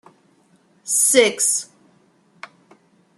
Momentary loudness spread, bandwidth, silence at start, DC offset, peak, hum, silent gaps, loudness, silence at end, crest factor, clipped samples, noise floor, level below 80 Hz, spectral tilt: 23 LU; 13.5 kHz; 0.85 s; under 0.1%; -2 dBFS; none; none; -16 LUFS; 1.55 s; 22 dB; under 0.1%; -58 dBFS; -68 dBFS; 0 dB/octave